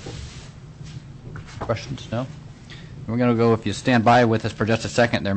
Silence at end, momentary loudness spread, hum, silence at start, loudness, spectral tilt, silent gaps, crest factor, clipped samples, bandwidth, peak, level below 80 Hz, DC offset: 0 s; 23 LU; none; 0 s; -21 LUFS; -6 dB/octave; none; 14 dB; under 0.1%; 8.6 kHz; -8 dBFS; -46 dBFS; under 0.1%